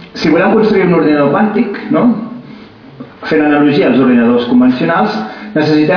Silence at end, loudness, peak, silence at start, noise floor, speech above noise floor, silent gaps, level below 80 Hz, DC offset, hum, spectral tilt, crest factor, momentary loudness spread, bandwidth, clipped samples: 0 s; -11 LUFS; 0 dBFS; 0 s; -33 dBFS; 24 dB; none; -48 dBFS; under 0.1%; none; -8 dB/octave; 10 dB; 9 LU; 5.4 kHz; under 0.1%